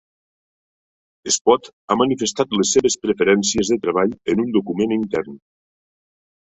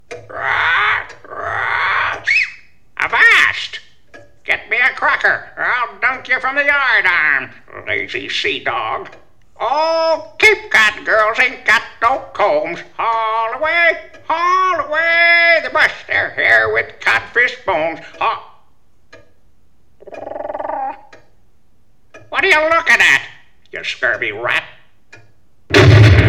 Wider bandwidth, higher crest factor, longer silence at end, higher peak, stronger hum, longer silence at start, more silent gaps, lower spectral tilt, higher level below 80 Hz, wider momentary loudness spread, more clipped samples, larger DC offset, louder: second, 8.4 kHz vs 14.5 kHz; about the same, 18 dB vs 16 dB; first, 1.2 s vs 0 s; about the same, -2 dBFS vs 0 dBFS; neither; first, 1.25 s vs 0.1 s; first, 1.41-1.45 s, 1.73-1.88 s vs none; about the same, -3.5 dB/octave vs -4.5 dB/octave; second, -54 dBFS vs -38 dBFS; second, 6 LU vs 15 LU; neither; second, under 0.1% vs 0.8%; second, -19 LUFS vs -14 LUFS